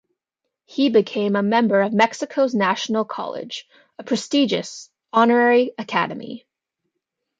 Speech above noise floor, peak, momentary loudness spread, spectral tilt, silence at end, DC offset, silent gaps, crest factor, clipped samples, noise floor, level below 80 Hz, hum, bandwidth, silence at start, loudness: 62 dB; -2 dBFS; 17 LU; -5 dB/octave; 1 s; under 0.1%; none; 20 dB; under 0.1%; -81 dBFS; -72 dBFS; none; 9.2 kHz; 0.7 s; -20 LUFS